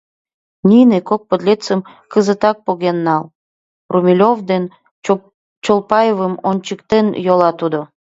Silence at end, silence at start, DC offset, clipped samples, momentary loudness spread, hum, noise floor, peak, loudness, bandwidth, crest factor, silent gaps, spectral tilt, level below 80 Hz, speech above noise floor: 0.15 s; 0.65 s; under 0.1%; under 0.1%; 9 LU; none; under -90 dBFS; 0 dBFS; -15 LUFS; 8 kHz; 14 dB; 3.35-3.89 s, 4.91-5.02 s, 5.34-5.62 s; -7 dB/octave; -56 dBFS; over 76 dB